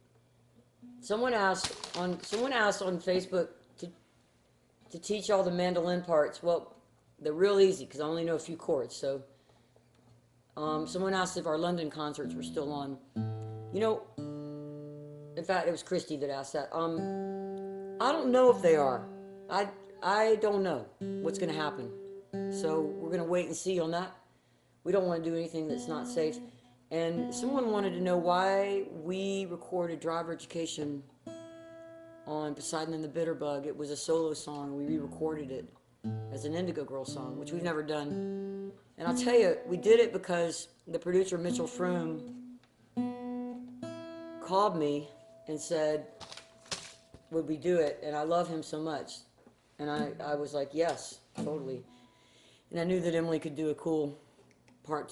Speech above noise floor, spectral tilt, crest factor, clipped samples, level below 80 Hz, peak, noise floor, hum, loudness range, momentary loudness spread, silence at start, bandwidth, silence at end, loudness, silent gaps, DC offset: 36 dB; -5 dB/octave; 22 dB; under 0.1%; -70 dBFS; -12 dBFS; -67 dBFS; none; 7 LU; 16 LU; 0.8 s; 12 kHz; 0 s; -33 LUFS; none; under 0.1%